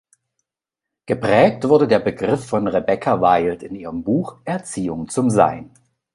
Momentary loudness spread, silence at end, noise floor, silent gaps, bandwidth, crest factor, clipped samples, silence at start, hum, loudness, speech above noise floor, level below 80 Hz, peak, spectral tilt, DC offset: 12 LU; 0.45 s; -86 dBFS; none; 11.5 kHz; 18 dB; under 0.1%; 1.1 s; none; -18 LUFS; 68 dB; -52 dBFS; -2 dBFS; -6.5 dB/octave; under 0.1%